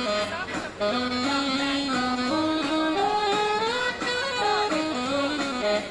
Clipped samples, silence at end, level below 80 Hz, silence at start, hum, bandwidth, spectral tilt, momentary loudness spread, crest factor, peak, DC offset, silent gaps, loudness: under 0.1%; 0 s; -56 dBFS; 0 s; none; 11.5 kHz; -3.5 dB/octave; 3 LU; 14 dB; -12 dBFS; under 0.1%; none; -25 LUFS